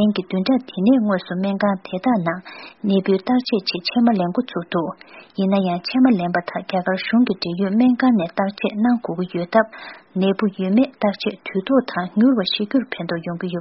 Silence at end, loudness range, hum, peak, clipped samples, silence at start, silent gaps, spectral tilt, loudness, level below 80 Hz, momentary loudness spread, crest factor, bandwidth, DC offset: 0 s; 2 LU; none; 0 dBFS; under 0.1%; 0 s; none; -5 dB/octave; -20 LUFS; -62 dBFS; 9 LU; 18 dB; 5.8 kHz; under 0.1%